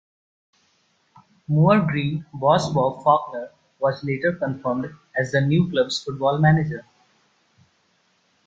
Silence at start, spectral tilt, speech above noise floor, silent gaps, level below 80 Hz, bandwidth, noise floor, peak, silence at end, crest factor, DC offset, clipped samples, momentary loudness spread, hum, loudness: 1.5 s; -7 dB/octave; 44 dB; none; -56 dBFS; 7.8 kHz; -65 dBFS; -4 dBFS; 1.65 s; 20 dB; under 0.1%; under 0.1%; 11 LU; none; -21 LUFS